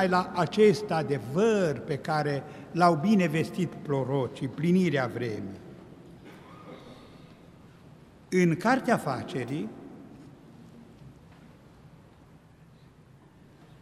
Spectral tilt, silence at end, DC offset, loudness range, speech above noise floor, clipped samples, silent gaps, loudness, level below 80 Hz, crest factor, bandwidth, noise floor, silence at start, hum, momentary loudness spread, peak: -6.5 dB/octave; 2.7 s; under 0.1%; 13 LU; 29 dB; under 0.1%; none; -27 LUFS; -64 dBFS; 22 dB; 13.5 kHz; -55 dBFS; 0 s; none; 25 LU; -8 dBFS